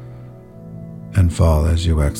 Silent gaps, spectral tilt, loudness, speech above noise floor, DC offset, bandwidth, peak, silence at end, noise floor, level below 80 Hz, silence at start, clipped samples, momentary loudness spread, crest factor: none; -7 dB/octave; -17 LUFS; 22 dB; under 0.1%; 13 kHz; -4 dBFS; 0 s; -37 dBFS; -24 dBFS; 0 s; under 0.1%; 23 LU; 14 dB